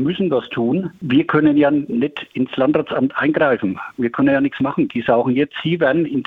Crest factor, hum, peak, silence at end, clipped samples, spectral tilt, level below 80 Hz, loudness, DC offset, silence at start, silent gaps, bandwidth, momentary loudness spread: 16 dB; none; -2 dBFS; 0.05 s; under 0.1%; -9 dB/octave; -56 dBFS; -18 LUFS; under 0.1%; 0 s; none; 4.3 kHz; 8 LU